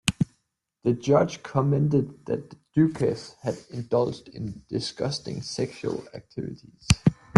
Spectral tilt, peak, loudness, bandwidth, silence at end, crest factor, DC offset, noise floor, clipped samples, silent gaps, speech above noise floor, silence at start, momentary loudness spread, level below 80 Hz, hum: -6 dB/octave; 0 dBFS; -27 LUFS; 12 kHz; 0 s; 26 dB; under 0.1%; -74 dBFS; under 0.1%; none; 48 dB; 0.05 s; 14 LU; -46 dBFS; none